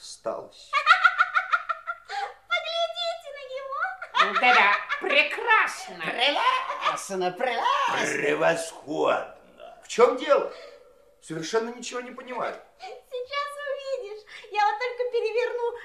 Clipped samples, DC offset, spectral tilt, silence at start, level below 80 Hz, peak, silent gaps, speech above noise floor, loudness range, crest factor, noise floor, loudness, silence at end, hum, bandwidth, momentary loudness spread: under 0.1%; under 0.1%; -2 dB/octave; 0 s; -72 dBFS; -4 dBFS; none; 30 dB; 10 LU; 22 dB; -55 dBFS; -25 LUFS; 0 s; none; 14 kHz; 16 LU